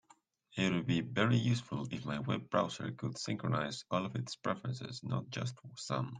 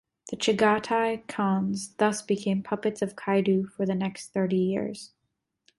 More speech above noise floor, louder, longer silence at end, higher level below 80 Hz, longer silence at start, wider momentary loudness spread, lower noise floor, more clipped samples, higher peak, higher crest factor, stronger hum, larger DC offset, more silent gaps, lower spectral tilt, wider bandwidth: second, 32 dB vs 54 dB; second, -36 LUFS vs -27 LUFS; second, 0 s vs 0.7 s; about the same, -70 dBFS vs -66 dBFS; first, 0.5 s vs 0.25 s; about the same, 9 LU vs 8 LU; second, -68 dBFS vs -80 dBFS; neither; second, -14 dBFS vs -10 dBFS; about the same, 22 dB vs 18 dB; neither; neither; neither; about the same, -6 dB/octave vs -5.5 dB/octave; second, 9.6 kHz vs 11.5 kHz